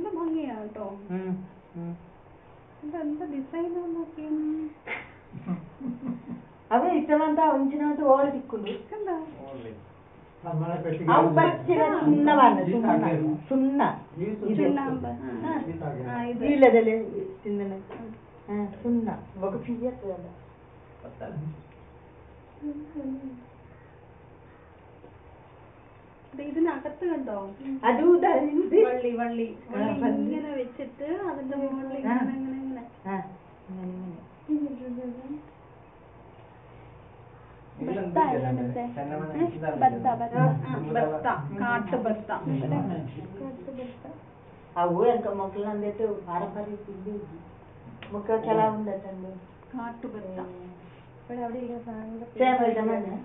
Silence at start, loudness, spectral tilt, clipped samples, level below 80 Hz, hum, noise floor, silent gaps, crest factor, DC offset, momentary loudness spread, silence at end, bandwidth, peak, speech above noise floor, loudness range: 0 s; -27 LUFS; -6.5 dB/octave; under 0.1%; -60 dBFS; none; -52 dBFS; none; 24 dB; under 0.1%; 19 LU; 0 s; 4 kHz; -4 dBFS; 25 dB; 14 LU